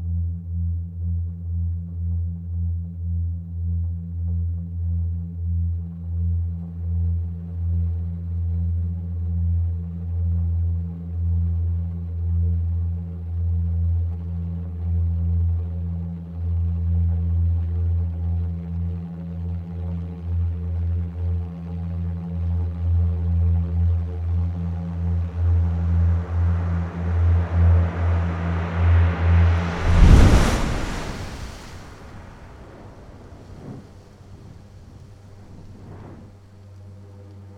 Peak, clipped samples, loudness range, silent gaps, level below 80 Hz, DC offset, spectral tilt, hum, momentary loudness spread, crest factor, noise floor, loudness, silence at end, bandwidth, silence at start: 0 dBFS; under 0.1%; 19 LU; none; -28 dBFS; under 0.1%; -7.5 dB/octave; none; 21 LU; 22 dB; -44 dBFS; -24 LUFS; 0 s; 8 kHz; 0 s